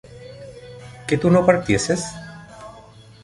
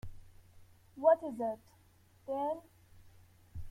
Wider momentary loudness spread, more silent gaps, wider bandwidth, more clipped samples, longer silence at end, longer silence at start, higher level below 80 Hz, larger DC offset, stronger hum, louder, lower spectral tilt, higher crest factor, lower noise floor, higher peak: about the same, 24 LU vs 24 LU; neither; second, 11.5 kHz vs 14.5 kHz; neither; first, 0.45 s vs 0 s; about the same, 0.1 s vs 0.05 s; first, -46 dBFS vs -58 dBFS; neither; neither; first, -19 LUFS vs -34 LUFS; second, -5.5 dB/octave vs -7.5 dB/octave; about the same, 20 dB vs 22 dB; second, -45 dBFS vs -65 dBFS; first, -2 dBFS vs -14 dBFS